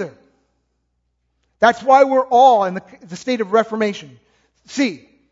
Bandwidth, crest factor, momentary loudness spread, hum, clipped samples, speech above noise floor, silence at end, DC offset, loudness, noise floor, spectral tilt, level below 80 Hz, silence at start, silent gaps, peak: 7.8 kHz; 18 dB; 19 LU; 60 Hz at -55 dBFS; under 0.1%; 54 dB; 0.35 s; under 0.1%; -16 LUFS; -69 dBFS; -4.5 dB/octave; -64 dBFS; 0 s; none; 0 dBFS